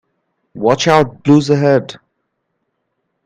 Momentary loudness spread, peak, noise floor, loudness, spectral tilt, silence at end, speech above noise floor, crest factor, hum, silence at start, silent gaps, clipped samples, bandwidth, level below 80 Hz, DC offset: 7 LU; 0 dBFS; -70 dBFS; -13 LUFS; -6 dB/octave; 1.35 s; 58 dB; 16 dB; none; 0.55 s; none; under 0.1%; 9.6 kHz; -54 dBFS; under 0.1%